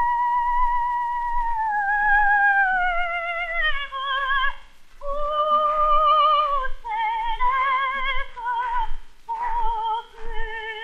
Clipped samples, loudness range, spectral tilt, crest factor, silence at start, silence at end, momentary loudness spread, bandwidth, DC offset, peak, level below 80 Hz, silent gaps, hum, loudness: under 0.1%; 4 LU; -3 dB/octave; 14 dB; 0 s; 0 s; 13 LU; 5.2 kHz; under 0.1%; -8 dBFS; -32 dBFS; none; none; -22 LUFS